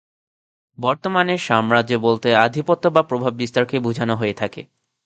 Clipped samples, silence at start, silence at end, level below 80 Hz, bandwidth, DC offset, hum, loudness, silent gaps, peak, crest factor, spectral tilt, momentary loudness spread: under 0.1%; 0.8 s; 0.4 s; -60 dBFS; 9 kHz; under 0.1%; none; -19 LUFS; none; 0 dBFS; 20 dB; -6 dB/octave; 7 LU